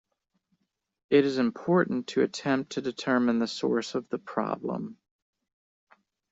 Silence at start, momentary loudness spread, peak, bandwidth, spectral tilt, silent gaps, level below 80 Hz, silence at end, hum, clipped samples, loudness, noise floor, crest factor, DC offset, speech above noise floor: 1.1 s; 9 LU; -10 dBFS; 8 kHz; -5.5 dB/octave; none; -70 dBFS; 1.4 s; none; under 0.1%; -28 LUFS; -76 dBFS; 20 dB; under 0.1%; 49 dB